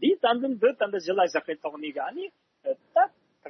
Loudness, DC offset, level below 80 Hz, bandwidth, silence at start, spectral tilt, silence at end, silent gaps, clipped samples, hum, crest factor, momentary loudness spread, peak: -27 LUFS; under 0.1%; -86 dBFS; 6.4 kHz; 0 s; -4.5 dB/octave; 0 s; none; under 0.1%; none; 16 dB; 10 LU; -10 dBFS